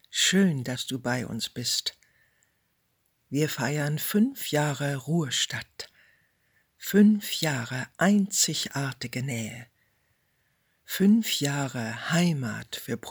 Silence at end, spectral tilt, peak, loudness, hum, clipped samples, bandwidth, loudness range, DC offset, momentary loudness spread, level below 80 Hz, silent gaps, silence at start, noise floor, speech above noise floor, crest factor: 0 s; -4 dB/octave; -10 dBFS; -26 LUFS; none; under 0.1%; over 20 kHz; 4 LU; under 0.1%; 13 LU; -68 dBFS; none; 0.15 s; -73 dBFS; 46 dB; 18 dB